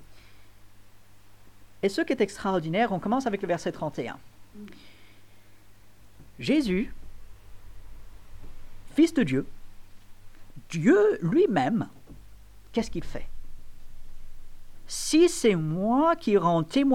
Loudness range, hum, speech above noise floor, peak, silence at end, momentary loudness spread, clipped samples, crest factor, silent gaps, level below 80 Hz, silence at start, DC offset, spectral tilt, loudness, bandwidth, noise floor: 8 LU; none; 31 dB; -10 dBFS; 0 s; 16 LU; under 0.1%; 18 dB; none; -46 dBFS; 0.05 s; 0.3%; -5.5 dB/octave; -26 LUFS; 16 kHz; -55 dBFS